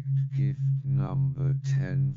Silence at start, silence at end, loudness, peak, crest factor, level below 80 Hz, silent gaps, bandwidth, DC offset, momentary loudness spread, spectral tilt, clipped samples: 0 s; 0 s; -28 LUFS; -18 dBFS; 8 dB; -58 dBFS; none; 6.8 kHz; under 0.1%; 2 LU; -9 dB/octave; under 0.1%